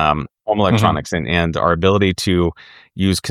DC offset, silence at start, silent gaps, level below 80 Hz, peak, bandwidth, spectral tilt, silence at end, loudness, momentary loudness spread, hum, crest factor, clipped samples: under 0.1%; 0 s; none; -36 dBFS; 0 dBFS; 15.5 kHz; -5.5 dB/octave; 0 s; -17 LUFS; 7 LU; none; 16 dB; under 0.1%